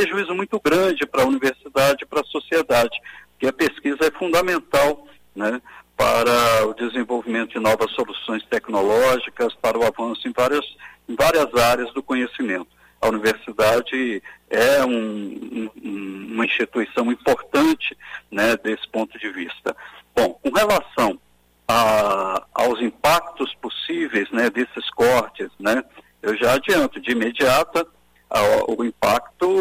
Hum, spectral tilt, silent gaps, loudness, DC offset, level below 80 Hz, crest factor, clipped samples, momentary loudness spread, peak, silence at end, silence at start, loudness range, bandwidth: none; -4 dB/octave; none; -20 LUFS; under 0.1%; -50 dBFS; 14 dB; under 0.1%; 12 LU; -6 dBFS; 0 s; 0 s; 2 LU; 16 kHz